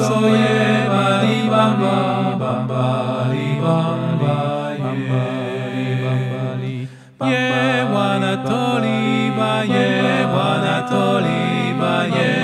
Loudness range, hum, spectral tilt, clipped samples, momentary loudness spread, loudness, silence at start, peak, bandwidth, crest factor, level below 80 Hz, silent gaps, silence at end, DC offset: 4 LU; none; -6.5 dB/octave; under 0.1%; 7 LU; -18 LUFS; 0 s; -2 dBFS; 12 kHz; 16 dB; -64 dBFS; none; 0 s; under 0.1%